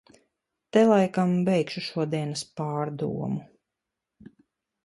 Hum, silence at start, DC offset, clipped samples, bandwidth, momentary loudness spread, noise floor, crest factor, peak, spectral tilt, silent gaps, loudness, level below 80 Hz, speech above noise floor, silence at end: none; 0.75 s; under 0.1%; under 0.1%; 11.5 kHz; 12 LU; -86 dBFS; 20 dB; -8 dBFS; -6.5 dB/octave; none; -26 LUFS; -66 dBFS; 61 dB; 1.4 s